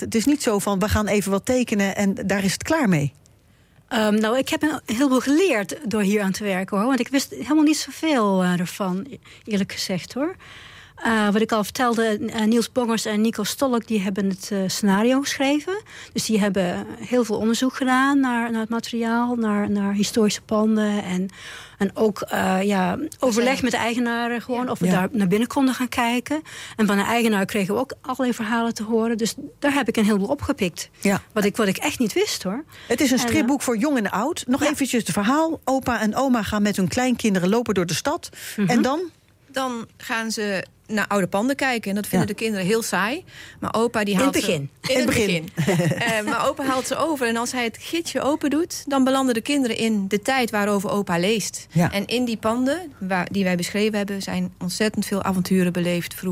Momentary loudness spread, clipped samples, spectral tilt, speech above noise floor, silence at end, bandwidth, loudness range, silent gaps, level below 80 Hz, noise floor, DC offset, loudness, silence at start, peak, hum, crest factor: 7 LU; under 0.1%; -4.5 dB/octave; 33 dB; 0 s; 16.5 kHz; 2 LU; none; -54 dBFS; -55 dBFS; under 0.1%; -22 LUFS; 0 s; -10 dBFS; none; 12 dB